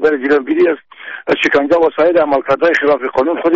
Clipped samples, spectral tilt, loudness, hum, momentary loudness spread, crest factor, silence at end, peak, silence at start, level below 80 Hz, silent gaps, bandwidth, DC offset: under 0.1%; -2.5 dB/octave; -13 LUFS; none; 6 LU; 10 dB; 0 s; -2 dBFS; 0 s; -52 dBFS; none; 7.8 kHz; 0.1%